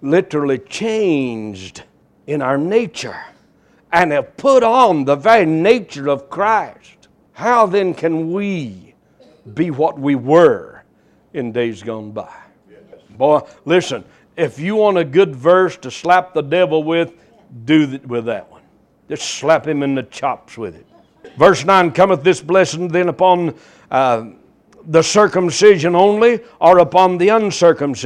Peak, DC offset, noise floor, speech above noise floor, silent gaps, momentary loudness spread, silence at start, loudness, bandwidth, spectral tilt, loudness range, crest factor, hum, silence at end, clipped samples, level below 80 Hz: 0 dBFS; under 0.1%; -54 dBFS; 39 dB; none; 15 LU; 0 s; -15 LUFS; 11 kHz; -5 dB/octave; 7 LU; 16 dB; none; 0 s; under 0.1%; -56 dBFS